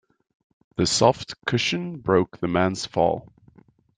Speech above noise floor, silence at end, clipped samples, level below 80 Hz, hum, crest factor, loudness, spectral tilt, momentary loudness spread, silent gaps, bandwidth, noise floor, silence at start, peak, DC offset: 33 dB; 0.8 s; under 0.1%; -56 dBFS; none; 22 dB; -23 LUFS; -4.5 dB/octave; 9 LU; none; 9.8 kHz; -55 dBFS; 0.8 s; -2 dBFS; under 0.1%